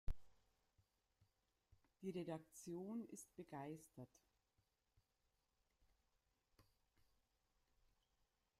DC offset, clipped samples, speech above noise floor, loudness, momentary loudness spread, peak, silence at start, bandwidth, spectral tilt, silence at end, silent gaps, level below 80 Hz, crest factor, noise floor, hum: under 0.1%; under 0.1%; 35 dB; -54 LUFS; 11 LU; -32 dBFS; 0.05 s; 15.5 kHz; -6 dB/octave; 2 s; none; -64 dBFS; 24 dB; -88 dBFS; none